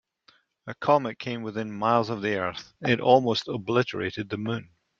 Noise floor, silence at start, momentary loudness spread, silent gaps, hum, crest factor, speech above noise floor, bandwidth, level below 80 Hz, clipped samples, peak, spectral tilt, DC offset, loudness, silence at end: -63 dBFS; 0.65 s; 12 LU; none; none; 22 dB; 37 dB; 7.6 kHz; -66 dBFS; under 0.1%; -6 dBFS; -6 dB/octave; under 0.1%; -26 LUFS; 0.35 s